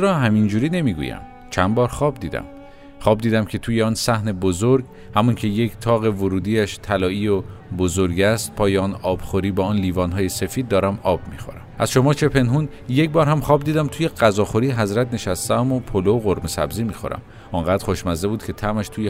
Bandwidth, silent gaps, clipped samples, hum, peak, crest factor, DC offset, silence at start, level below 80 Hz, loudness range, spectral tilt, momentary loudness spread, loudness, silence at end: 16 kHz; none; under 0.1%; none; 0 dBFS; 18 dB; under 0.1%; 0 s; -40 dBFS; 3 LU; -6 dB/octave; 8 LU; -20 LUFS; 0 s